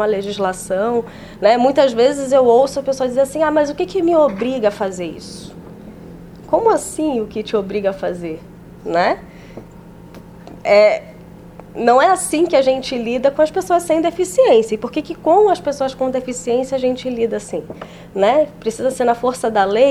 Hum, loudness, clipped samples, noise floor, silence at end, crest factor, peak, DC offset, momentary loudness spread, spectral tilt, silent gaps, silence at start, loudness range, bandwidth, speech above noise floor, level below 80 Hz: none; -16 LUFS; under 0.1%; -38 dBFS; 0 s; 16 dB; 0 dBFS; under 0.1%; 20 LU; -4.5 dB/octave; none; 0 s; 6 LU; 15 kHz; 22 dB; -48 dBFS